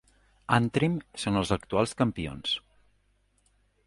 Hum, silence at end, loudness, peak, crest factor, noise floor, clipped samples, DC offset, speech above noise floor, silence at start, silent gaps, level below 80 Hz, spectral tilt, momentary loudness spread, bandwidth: 50 Hz at -50 dBFS; 1.3 s; -28 LUFS; -6 dBFS; 24 dB; -69 dBFS; under 0.1%; under 0.1%; 41 dB; 0.5 s; none; -52 dBFS; -5.5 dB/octave; 7 LU; 11.5 kHz